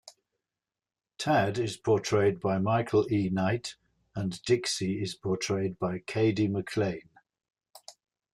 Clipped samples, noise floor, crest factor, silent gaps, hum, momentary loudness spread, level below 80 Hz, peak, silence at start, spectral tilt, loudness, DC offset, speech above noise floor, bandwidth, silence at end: under 0.1%; under -90 dBFS; 16 dB; none; none; 8 LU; -64 dBFS; -14 dBFS; 0.05 s; -5.5 dB/octave; -29 LUFS; under 0.1%; over 62 dB; 13 kHz; 0.45 s